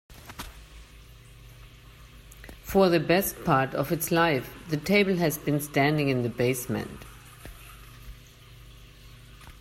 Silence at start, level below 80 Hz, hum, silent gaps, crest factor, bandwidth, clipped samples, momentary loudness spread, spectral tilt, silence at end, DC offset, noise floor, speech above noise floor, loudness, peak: 0.1 s; -50 dBFS; 50 Hz at -50 dBFS; none; 20 dB; 16 kHz; under 0.1%; 24 LU; -5.5 dB/octave; 0.1 s; under 0.1%; -50 dBFS; 25 dB; -25 LUFS; -8 dBFS